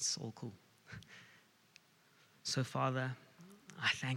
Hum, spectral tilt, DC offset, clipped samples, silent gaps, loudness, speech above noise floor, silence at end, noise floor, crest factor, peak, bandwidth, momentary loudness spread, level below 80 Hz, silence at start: none; -3.5 dB/octave; under 0.1%; under 0.1%; none; -39 LUFS; 30 dB; 0 s; -69 dBFS; 20 dB; -22 dBFS; 16 kHz; 22 LU; -82 dBFS; 0 s